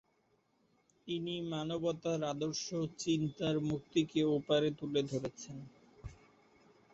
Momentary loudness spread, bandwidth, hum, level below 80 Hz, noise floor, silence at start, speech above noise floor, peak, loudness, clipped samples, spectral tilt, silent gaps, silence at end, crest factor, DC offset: 20 LU; 8 kHz; none; -66 dBFS; -75 dBFS; 1.05 s; 40 dB; -20 dBFS; -36 LUFS; under 0.1%; -5.5 dB/octave; none; 0.8 s; 18 dB; under 0.1%